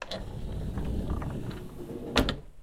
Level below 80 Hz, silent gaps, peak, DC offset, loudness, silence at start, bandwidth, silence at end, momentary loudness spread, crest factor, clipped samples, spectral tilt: -38 dBFS; none; -6 dBFS; under 0.1%; -34 LUFS; 0 s; 16.5 kHz; 0 s; 12 LU; 28 dB; under 0.1%; -5.5 dB/octave